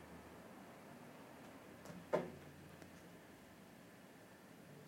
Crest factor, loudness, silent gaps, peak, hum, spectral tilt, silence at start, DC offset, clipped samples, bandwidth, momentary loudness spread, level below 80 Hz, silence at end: 28 dB; -53 LUFS; none; -24 dBFS; none; -5.5 dB/octave; 0 s; under 0.1%; under 0.1%; 16.5 kHz; 17 LU; -78 dBFS; 0 s